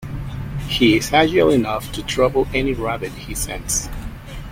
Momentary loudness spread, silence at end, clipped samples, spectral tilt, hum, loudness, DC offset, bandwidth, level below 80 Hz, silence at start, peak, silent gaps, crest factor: 15 LU; 0 s; under 0.1%; -4 dB/octave; none; -19 LUFS; under 0.1%; 16.5 kHz; -34 dBFS; 0 s; -2 dBFS; none; 16 dB